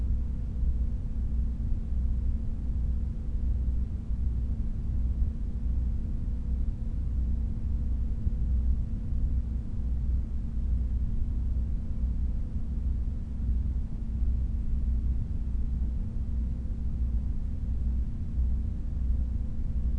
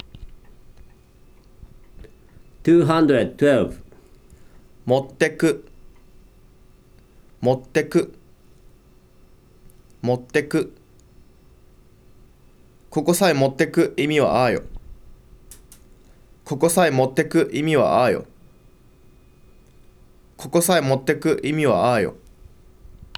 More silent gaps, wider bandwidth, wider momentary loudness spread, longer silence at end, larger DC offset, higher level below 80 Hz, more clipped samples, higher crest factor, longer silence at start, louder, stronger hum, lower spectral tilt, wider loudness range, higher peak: neither; second, 1.9 kHz vs 17.5 kHz; second, 3 LU vs 11 LU; second, 0 s vs 0.15 s; first, 0.2% vs under 0.1%; first, -30 dBFS vs -48 dBFS; neither; about the same, 14 dB vs 18 dB; second, 0 s vs 0.15 s; second, -33 LUFS vs -20 LUFS; neither; first, -10 dB/octave vs -5.5 dB/octave; second, 1 LU vs 7 LU; second, -16 dBFS vs -4 dBFS